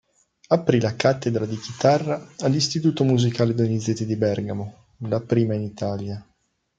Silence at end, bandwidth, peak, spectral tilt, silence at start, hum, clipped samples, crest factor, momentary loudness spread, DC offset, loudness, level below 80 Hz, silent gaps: 0.55 s; 9 kHz; -2 dBFS; -6 dB/octave; 0.5 s; none; under 0.1%; 20 dB; 10 LU; under 0.1%; -23 LUFS; -60 dBFS; none